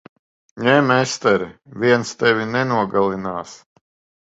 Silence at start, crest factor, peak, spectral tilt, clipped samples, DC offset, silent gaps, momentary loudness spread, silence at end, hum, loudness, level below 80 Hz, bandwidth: 0.55 s; 20 dB; 0 dBFS; -5 dB/octave; under 0.1%; under 0.1%; none; 12 LU; 0.65 s; none; -18 LUFS; -58 dBFS; 8 kHz